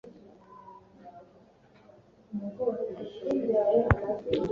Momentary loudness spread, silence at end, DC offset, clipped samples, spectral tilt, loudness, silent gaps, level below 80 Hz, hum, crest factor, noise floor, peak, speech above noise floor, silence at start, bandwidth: 26 LU; 0 s; under 0.1%; under 0.1%; -8.5 dB/octave; -29 LUFS; none; -48 dBFS; none; 30 dB; -58 dBFS; -2 dBFS; 30 dB; 0.05 s; 7.2 kHz